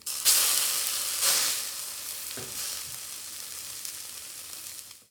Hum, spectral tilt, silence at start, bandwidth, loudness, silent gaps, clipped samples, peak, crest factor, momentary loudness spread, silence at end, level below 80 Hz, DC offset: none; 2 dB/octave; 0 s; over 20 kHz; -27 LUFS; none; under 0.1%; -4 dBFS; 28 dB; 17 LU; 0.1 s; -68 dBFS; under 0.1%